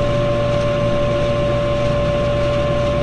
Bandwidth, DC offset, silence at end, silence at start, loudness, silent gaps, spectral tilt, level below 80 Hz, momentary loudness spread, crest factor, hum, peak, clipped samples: 9.8 kHz; 0.7%; 0 s; 0 s; -18 LUFS; none; -7 dB/octave; -28 dBFS; 0 LU; 12 dB; none; -6 dBFS; under 0.1%